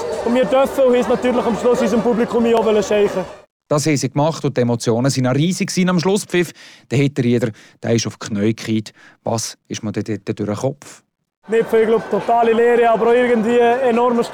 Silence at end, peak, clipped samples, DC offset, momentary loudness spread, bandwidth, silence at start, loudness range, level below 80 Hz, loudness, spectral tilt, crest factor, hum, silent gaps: 0 s; -8 dBFS; under 0.1%; under 0.1%; 10 LU; 17 kHz; 0 s; 6 LU; -52 dBFS; -17 LUFS; -5.5 dB/octave; 10 dB; none; 3.50-3.60 s, 11.37-11.42 s